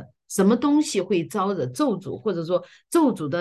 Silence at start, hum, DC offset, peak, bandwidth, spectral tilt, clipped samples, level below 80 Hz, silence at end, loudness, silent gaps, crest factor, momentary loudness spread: 0 s; none; under 0.1%; -8 dBFS; 12.5 kHz; -5.5 dB/octave; under 0.1%; -66 dBFS; 0 s; -23 LUFS; none; 14 dB; 8 LU